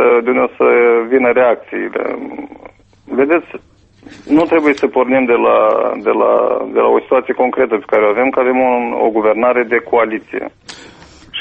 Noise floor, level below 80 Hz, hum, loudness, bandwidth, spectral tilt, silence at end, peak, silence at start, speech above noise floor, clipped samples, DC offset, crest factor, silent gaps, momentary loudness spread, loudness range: -39 dBFS; -54 dBFS; none; -13 LUFS; 8.2 kHz; -6 dB/octave; 0 s; 0 dBFS; 0 s; 26 dB; under 0.1%; under 0.1%; 14 dB; none; 14 LU; 4 LU